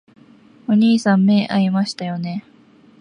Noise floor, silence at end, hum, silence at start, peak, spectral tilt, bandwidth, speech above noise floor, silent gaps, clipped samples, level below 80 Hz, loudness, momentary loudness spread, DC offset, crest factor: -49 dBFS; 0.6 s; none; 0.7 s; -6 dBFS; -6.5 dB/octave; 10 kHz; 33 dB; none; under 0.1%; -66 dBFS; -17 LUFS; 13 LU; under 0.1%; 12 dB